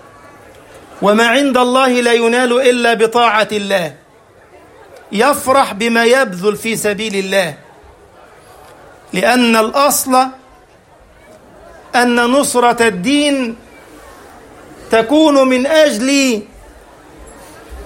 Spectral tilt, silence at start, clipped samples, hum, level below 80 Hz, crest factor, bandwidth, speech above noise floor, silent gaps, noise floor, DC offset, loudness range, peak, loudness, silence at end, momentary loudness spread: -3 dB/octave; 0.75 s; under 0.1%; none; -48 dBFS; 14 dB; 16.5 kHz; 33 dB; none; -45 dBFS; under 0.1%; 3 LU; 0 dBFS; -12 LUFS; 0 s; 7 LU